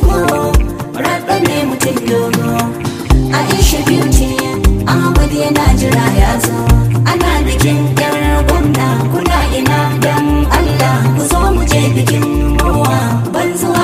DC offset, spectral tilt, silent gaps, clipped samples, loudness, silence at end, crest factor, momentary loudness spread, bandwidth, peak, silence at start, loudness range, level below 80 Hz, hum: under 0.1%; -5.5 dB/octave; none; under 0.1%; -12 LUFS; 0 s; 12 dB; 4 LU; 16 kHz; 0 dBFS; 0 s; 1 LU; -18 dBFS; none